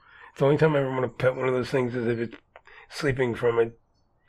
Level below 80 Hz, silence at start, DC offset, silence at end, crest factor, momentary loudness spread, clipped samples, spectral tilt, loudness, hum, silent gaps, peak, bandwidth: -54 dBFS; 0.2 s; under 0.1%; 0.55 s; 16 dB; 8 LU; under 0.1%; -7 dB/octave; -25 LUFS; none; none; -10 dBFS; 13 kHz